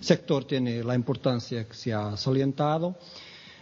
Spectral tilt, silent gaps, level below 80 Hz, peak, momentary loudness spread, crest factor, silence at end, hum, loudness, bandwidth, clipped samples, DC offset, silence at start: -6.5 dB/octave; none; -64 dBFS; -6 dBFS; 15 LU; 22 dB; 0.1 s; none; -28 LUFS; 7.8 kHz; under 0.1%; under 0.1%; 0 s